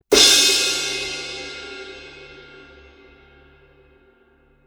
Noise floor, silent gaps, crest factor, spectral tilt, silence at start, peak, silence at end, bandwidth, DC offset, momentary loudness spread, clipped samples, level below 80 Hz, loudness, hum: -57 dBFS; none; 22 dB; 0.5 dB/octave; 0.1 s; 0 dBFS; 2.25 s; over 20 kHz; under 0.1%; 26 LU; under 0.1%; -52 dBFS; -15 LUFS; none